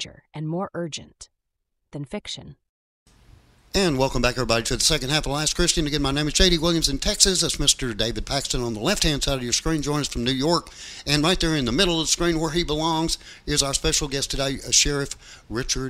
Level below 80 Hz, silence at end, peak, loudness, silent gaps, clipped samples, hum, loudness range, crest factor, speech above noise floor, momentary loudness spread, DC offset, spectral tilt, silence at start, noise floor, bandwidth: -34 dBFS; 0 s; 0 dBFS; -22 LUFS; 2.69-3.06 s; under 0.1%; none; 8 LU; 24 dB; 54 dB; 14 LU; under 0.1%; -3 dB/octave; 0 s; -77 dBFS; 16 kHz